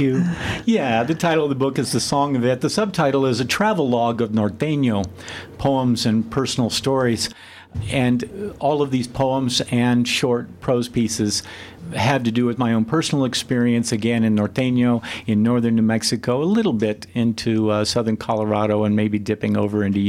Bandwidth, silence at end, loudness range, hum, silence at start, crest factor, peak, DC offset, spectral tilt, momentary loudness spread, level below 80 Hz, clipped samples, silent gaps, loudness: 15.5 kHz; 0 s; 2 LU; none; 0 s; 14 dB; -4 dBFS; under 0.1%; -5.5 dB/octave; 5 LU; -50 dBFS; under 0.1%; none; -20 LUFS